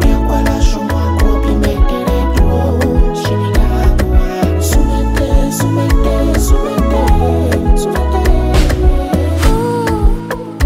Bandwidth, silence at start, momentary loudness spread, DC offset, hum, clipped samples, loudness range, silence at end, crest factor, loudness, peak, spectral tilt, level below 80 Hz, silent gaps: 16 kHz; 0 s; 2 LU; under 0.1%; none; under 0.1%; 1 LU; 0 s; 10 dB; -14 LUFS; 0 dBFS; -6.5 dB/octave; -12 dBFS; none